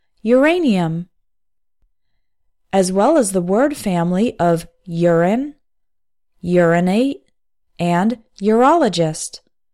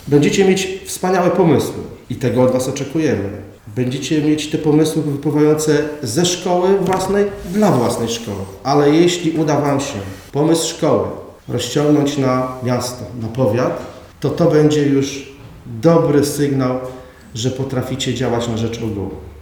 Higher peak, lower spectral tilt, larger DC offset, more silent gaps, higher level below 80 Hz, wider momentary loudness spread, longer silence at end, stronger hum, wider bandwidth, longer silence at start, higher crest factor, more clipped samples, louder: about the same, -2 dBFS vs 0 dBFS; about the same, -6 dB/octave vs -5.5 dB/octave; neither; neither; second, -52 dBFS vs -46 dBFS; second, 10 LU vs 13 LU; first, 0.35 s vs 0 s; neither; second, 15 kHz vs 20 kHz; first, 0.25 s vs 0 s; about the same, 14 dB vs 16 dB; neither; about the same, -16 LUFS vs -17 LUFS